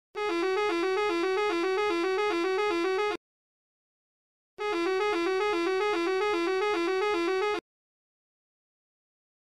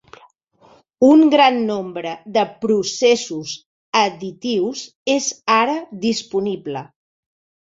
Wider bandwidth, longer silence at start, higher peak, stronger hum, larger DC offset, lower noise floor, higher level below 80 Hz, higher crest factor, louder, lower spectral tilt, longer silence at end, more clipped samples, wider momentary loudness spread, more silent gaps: first, 12.5 kHz vs 7.8 kHz; second, 0.15 s vs 1 s; second, -16 dBFS vs -2 dBFS; neither; first, 0.1% vs under 0.1%; first, under -90 dBFS vs -53 dBFS; about the same, -68 dBFS vs -64 dBFS; about the same, 14 dB vs 18 dB; second, -28 LUFS vs -18 LUFS; about the same, -3 dB/octave vs -3.5 dB/octave; first, 1.9 s vs 0.8 s; neither; second, 3 LU vs 15 LU; first, 3.17-4.57 s vs 3.66-3.93 s, 4.95-5.06 s